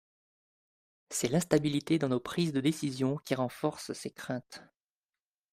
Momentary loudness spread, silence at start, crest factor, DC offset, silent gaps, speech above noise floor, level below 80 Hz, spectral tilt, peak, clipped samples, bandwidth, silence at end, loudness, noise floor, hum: 11 LU; 1.1 s; 24 dB; under 0.1%; none; over 58 dB; -66 dBFS; -5.5 dB/octave; -10 dBFS; under 0.1%; 16 kHz; 0.9 s; -32 LUFS; under -90 dBFS; none